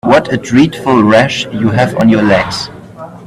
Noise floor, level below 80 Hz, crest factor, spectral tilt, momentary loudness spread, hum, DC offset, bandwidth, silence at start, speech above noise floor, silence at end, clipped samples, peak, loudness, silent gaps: -30 dBFS; -42 dBFS; 10 dB; -6 dB/octave; 13 LU; none; under 0.1%; 13 kHz; 0.05 s; 20 dB; 0 s; under 0.1%; 0 dBFS; -10 LUFS; none